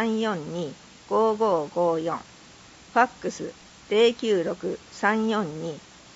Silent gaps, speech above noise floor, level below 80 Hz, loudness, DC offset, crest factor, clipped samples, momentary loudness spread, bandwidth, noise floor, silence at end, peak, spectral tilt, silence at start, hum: none; 25 dB; -64 dBFS; -25 LUFS; under 0.1%; 20 dB; under 0.1%; 14 LU; 8 kHz; -49 dBFS; 0.35 s; -6 dBFS; -5 dB/octave; 0 s; none